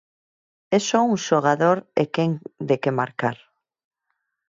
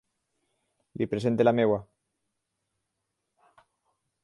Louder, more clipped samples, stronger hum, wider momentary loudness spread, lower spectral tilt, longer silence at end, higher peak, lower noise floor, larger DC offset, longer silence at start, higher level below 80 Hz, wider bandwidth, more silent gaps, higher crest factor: first, -22 LUFS vs -26 LUFS; neither; neither; second, 8 LU vs 11 LU; second, -5.5 dB/octave vs -8 dB/octave; second, 1.15 s vs 2.4 s; first, -4 dBFS vs -10 dBFS; second, -77 dBFS vs -82 dBFS; neither; second, 0.7 s vs 1 s; about the same, -68 dBFS vs -66 dBFS; second, 8 kHz vs 11.5 kHz; neither; about the same, 18 dB vs 22 dB